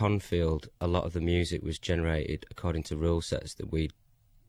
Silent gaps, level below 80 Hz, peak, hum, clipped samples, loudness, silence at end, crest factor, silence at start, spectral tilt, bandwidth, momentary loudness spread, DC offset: none; -40 dBFS; -14 dBFS; none; under 0.1%; -31 LUFS; 0.6 s; 16 dB; 0 s; -6.5 dB/octave; 14 kHz; 6 LU; under 0.1%